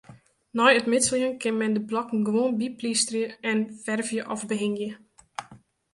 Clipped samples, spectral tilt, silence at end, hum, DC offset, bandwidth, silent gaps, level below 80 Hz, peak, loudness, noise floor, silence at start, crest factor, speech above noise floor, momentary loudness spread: under 0.1%; -3 dB/octave; 0.35 s; none; under 0.1%; 11.5 kHz; none; -68 dBFS; -4 dBFS; -25 LUFS; -53 dBFS; 0.1 s; 22 dB; 28 dB; 14 LU